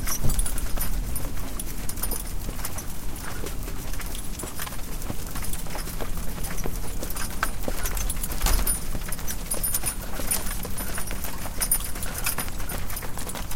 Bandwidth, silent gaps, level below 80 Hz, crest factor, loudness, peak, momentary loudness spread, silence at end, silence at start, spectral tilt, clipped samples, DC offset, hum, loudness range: 17 kHz; none; -30 dBFS; 18 dB; -30 LUFS; -6 dBFS; 9 LU; 0 s; 0 s; -3 dB/octave; under 0.1%; under 0.1%; none; 6 LU